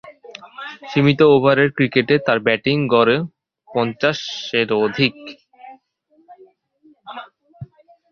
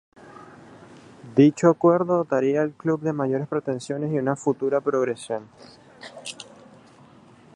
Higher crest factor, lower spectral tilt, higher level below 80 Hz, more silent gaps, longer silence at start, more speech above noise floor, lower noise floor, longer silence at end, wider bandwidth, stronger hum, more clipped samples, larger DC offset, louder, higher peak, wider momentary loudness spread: about the same, 18 dB vs 22 dB; about the same, -6.5 dB/octave vs -7 dB/octave; first, -56 dBFS vs -70 dBFS; neither; second, 0.05 s vs 0.3 s; first, 43 dB vs 28 dB; first, -59 dBFS vs -51 dBFS; second, 0.45 s vs 1.1 s; second, 6.8 kHz vs 11.5 kHz; neither; neither; neither; first, -17 LUFS vs -23 LUFS; about the same, -2 dBFS vs -2 dBFS; first, 23 LU vs 19 LU